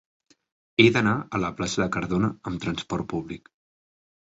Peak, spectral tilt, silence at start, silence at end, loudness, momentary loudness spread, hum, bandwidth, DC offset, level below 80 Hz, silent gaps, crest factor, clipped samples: -2 dBFS; -5.5 dB/octave; 0.8 s; 0.85 s; -25 LUFS; 13 LU; none; 8 kHz; under 0.1%; -52 dBFS; none; 24 dB; under 0.1%